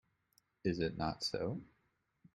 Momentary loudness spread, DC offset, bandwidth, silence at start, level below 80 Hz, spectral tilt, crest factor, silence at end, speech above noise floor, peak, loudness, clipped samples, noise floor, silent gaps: 5 LU; under 0.1%; 13 kHz; 0.65 s; -62 dBFS; -5.5 dB/octave; 20 dB; 0.7 s; 42 dB; -22 dBFS; -39 LUFS; under 0.1%; -80 dBFS; none